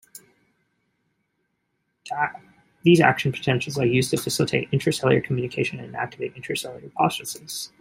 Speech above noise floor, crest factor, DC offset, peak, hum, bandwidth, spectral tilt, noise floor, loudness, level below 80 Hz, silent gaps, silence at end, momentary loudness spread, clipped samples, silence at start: 51 dB; 22 dB; under 0.1%; -2 dBFS; none; 16 kHz; -5 dB/octave; -74 dBFS; -23 LUFS; -60 dBFS; none; 0.15 s; 13 LU; under 0.1%; 0.15 s